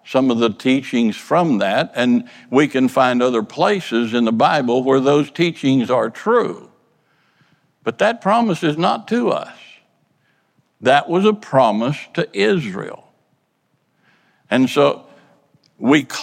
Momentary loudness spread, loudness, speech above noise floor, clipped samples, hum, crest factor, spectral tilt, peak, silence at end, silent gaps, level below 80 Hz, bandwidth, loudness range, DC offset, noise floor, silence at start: 8 LU; -17 LUFS; 49 dB; under 0.1%; none; 16 dB; -6 dB/octave; -2 dBFS; 0 s; none; -68 dBFS; 14 kHz; 5 LU; under 0.1%; -66 dBFS; 0.05 s